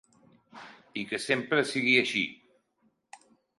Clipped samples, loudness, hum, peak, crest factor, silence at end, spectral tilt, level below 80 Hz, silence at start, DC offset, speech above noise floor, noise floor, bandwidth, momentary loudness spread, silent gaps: under 0.1%; -27 LUFS; none; -10 dBFS; 22 dB; 0.45 s; -3.5 dB/octave; -76 dBFS; 0.55 s; under 0.1%; 45 dB; -72 dBFS; 11.5 kHz; 25 LU; none